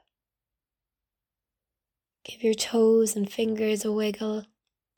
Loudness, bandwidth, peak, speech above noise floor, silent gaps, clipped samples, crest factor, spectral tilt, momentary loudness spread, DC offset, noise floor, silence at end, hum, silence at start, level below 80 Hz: -26 LUFS; 19 kHz; -14 dBFS; 65 dB; none; under 0.1%; 16 dB; -4 dB/octave; 11 LU; under 0.1%; -90 dBFS; 0.55 s; none; 2.3 s; -72 dBFS